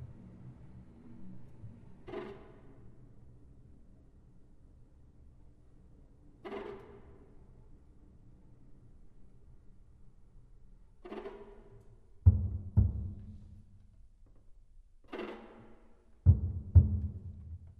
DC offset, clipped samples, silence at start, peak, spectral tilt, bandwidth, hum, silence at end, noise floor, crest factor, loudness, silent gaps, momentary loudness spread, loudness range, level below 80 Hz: under 0.1%; under 0.1%; 0 s; -10 dBFS; -10.5 dB/octave; 3.8 kHz; none; 0.15 s; -59 dBFS; 26 dB; -33 LUFS; none; 28 LU; 21 LU; -42 dBFS